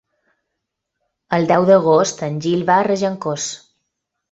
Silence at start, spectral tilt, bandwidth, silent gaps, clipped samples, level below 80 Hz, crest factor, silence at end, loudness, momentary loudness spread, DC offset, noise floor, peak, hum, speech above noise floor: 1.3 s; -5 dB/octave; 8 kHz; none; under 0.1%; -60 dBFS; 18 dB; 0.75 s; -17 LUFS; 11 LU; under 0.1%; -78 dBFS; 0 dBFS; none; 62 dB